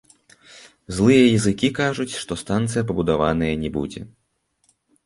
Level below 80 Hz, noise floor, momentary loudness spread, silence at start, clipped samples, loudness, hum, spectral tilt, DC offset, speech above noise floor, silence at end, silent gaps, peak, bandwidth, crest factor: -44 dBFS; -69 dBFS; 14 LU; 0.55 s; under 0.1%; -20 LUFS; none; -5.5 dB/octave; under 0.1%; 49 dB; 1 s; none; -4 dBFS; 11.5 kHz; 18 dB